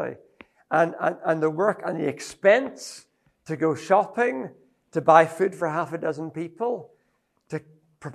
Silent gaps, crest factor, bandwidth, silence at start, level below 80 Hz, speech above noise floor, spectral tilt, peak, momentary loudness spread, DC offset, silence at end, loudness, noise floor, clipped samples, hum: none; 24 dB; 13 kHz; 0 s; -74 dBFS; 47 dB; -5.5 dB/octave; -2 dBFS; 18 LU; under 0.1%; 0 s; -24 LUFS; -70 dBFS; under 0.1%; none